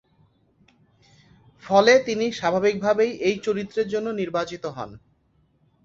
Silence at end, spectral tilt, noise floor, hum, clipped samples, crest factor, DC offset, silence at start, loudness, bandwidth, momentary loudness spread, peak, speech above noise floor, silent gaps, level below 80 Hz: 0.9 s; -4.5 dB/octave; -64 dBFS; none; under 0.1%; 22 dB; under 0.1%; 1.65 s; -22 LUFS; 7.6 kHz; 15 LU; -2 dBFS; 42 dB; none; -62 dBFS